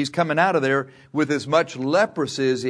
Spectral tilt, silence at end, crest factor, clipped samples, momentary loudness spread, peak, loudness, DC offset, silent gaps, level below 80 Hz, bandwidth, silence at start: -5 dB/octave; 0 s; 18 dB; under 0.1%; 5 LU; -4 dBFS; -21 LUFS; under 0.1%; none; -68 dBFS; 11 kHz; 0 s